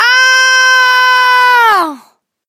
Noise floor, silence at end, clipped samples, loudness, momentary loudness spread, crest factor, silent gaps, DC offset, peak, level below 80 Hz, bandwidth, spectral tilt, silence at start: -46 dBFS; 0.5 s; under 0.1%; -6 LUFS; 4 LU; 8 dB; none; under 0.1%; 0 dBFS; -68 dBFS; 16 kHz; 2 dB/octave; 0 s